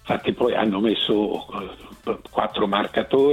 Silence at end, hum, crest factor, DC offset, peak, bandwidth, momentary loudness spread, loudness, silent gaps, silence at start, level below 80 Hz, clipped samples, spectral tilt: 0 s; none; 18 dB; under 0.1%; -4 dBFS; 13.5 kHz; 13 LU; -22 LUFS; none; 0.05 s; -52 dBFS; under 0.1%; -6.5 dB/octave